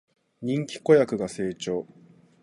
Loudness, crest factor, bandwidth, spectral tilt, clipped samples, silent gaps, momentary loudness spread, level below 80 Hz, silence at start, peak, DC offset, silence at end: -25 LUFS; 20 dB; 11.5 kHz; -6 dB/octave; under 0.1%; none; 14 LU; -64 dBFS; 0.4 s; -6 dBFS; under 0.1%; 0.6 s